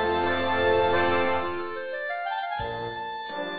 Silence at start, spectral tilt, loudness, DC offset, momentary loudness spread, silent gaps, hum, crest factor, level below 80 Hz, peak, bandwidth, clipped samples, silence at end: 0 s; -8 dB/octave; -26 LUFS; under 0.1%; 10 LU; none; none; 14 dB; -52 dBFS; -12 dBFS; 5.2 kHz; under 0.1%; 0 s